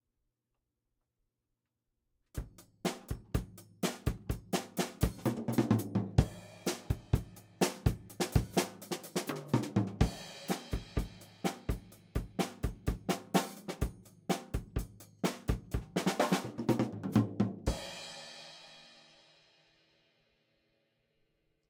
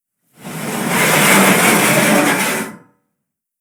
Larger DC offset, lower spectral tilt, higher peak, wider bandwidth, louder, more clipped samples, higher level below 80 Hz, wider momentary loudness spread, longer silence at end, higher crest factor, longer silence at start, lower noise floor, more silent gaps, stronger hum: neither; first, -5.5 dB/octave vs -3 dB/octave; second, -10 dBFS vs 0 dBFS; second, 18 kHz vs over 20 kHz; second, -36 LUFS vs -12 LUFS; neither; first, -46 dBFS vs -60 dBFS; about the same, 15 LU vs 16 LU; first, 2.8 s vs 0.85 s; first, 26 dB vs 16 dB; first, 2.35 s vs 0.4 s; first, -86 dBFS vs -76 dBFS; neither; neither